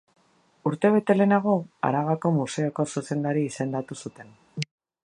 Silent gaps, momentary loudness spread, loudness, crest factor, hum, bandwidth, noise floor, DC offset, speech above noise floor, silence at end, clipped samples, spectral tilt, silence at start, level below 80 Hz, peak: none; 15 LU; -25 LUFS; 18 dB; none; 11 kHz; -51 dBFS; under 0.1%; 26 dB; 0.4 s; under 0.1%; -6.5 dB/octave; 0.65 s; -70 dBFS; -6 dBFS